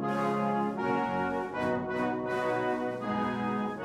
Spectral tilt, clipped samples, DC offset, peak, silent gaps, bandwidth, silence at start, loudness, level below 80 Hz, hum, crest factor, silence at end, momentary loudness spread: -7 dB/octave; under 0.1%; under 0.1%; -18 dBFS; none; 13 kHz; 0 s; -31 LUFS; -62 dBFS; none; 12 dB; 0 s; 3 LU